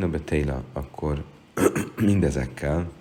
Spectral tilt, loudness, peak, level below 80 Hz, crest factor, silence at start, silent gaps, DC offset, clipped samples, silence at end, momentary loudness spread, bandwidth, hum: -7 dB/octave; -26 LUFS; -6 dBFS; -38 dBFS; 20 dB; 0 s; none; under 0.1%; under 0.1%; 0 s; 10 LU; 17 kHz; none